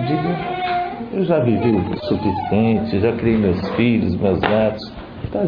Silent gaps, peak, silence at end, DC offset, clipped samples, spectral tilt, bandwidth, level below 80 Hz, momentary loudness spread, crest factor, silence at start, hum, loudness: none; 0 dBFS; 0 s; under 0.1%; under 0.1%; -10 dB/octave; 5.2 kHz; -42 dBFS; 6 LU; 18 dB; 0 s; none; -19 LUFS